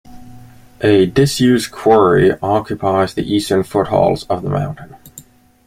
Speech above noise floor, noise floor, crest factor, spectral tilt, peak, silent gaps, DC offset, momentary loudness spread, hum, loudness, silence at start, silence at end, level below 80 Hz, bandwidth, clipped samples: 28 dB; -42 dBFS; 14 dB; -6 dB/octave; -2 dBFS; none; under 0.1%; 8 LU; none; -15 LUFS; 0.1 s; 0.45 s; -42 dBFS; 16 kHz; under 0.1%